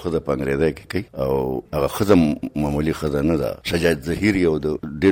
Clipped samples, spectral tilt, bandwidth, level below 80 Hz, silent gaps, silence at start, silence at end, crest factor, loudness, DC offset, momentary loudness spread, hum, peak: under 0.1%; -6.5 dB/octave; 17 kHz; -38 dBFS; none; 0 s; 0 s; 16 dB; -21 LUFS; under 0.1%; 7 LU; none; -4 dBFS